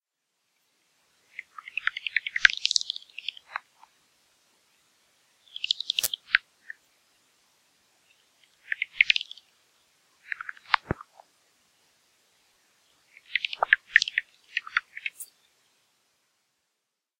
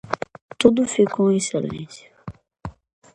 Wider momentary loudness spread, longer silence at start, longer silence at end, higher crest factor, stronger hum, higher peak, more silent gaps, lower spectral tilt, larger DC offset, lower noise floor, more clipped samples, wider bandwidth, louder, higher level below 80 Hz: about the same, 22 LU vs 22 LU; first, 1.65 s vs 0.1 s; first, 1.95 s vs 0.45 s; first, 32 dB vs 22 dB; neither; about the same, 0 dBFS vs 0 dBFS; second, none vs 0.41-0.49 s; second, 0 dB/octave vs -5 dB/octave; neither; first, -82 dBFS vs -40 dBFS; neither; first, 16 kHz vs 11.5 kHz; second, -27 LUFS vs -20 LUFS; second, -62 dBFS vs -52 dBFS